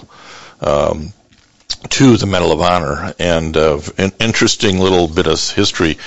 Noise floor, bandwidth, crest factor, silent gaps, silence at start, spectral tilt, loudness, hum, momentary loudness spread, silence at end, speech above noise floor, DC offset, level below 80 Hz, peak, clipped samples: -51 dBFS; 8.2 kHz; 14 dB; none; 0 s; -4.5 dB/octave; -14 LUFS; none; 10 LU; 0 s; 37 dB; 2%; -38 dBFS; 0 dBFS; under 0.1%